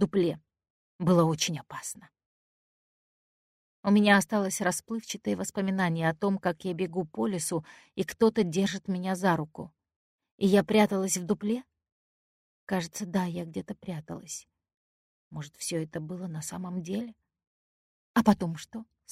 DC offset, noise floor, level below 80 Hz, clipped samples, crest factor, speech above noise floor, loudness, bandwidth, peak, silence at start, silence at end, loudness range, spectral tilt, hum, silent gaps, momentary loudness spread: under 0.1%; under -90 dBFS; -66 dBFS; under 0.1%; 24 dB; over 61 dB; -29 LUFS; 15.5 kHz; -6 dBFS; 0 s; 0.3 s; 10 LU; -5 dB/octave; none; 0.70-0.99 s, 2.26-3.83 s, 9.96-10.19 s, 10.31-10.38 s, 11.92-12.67 s, 14.74-15.31 s, 17.47-18.14 s; 16 LU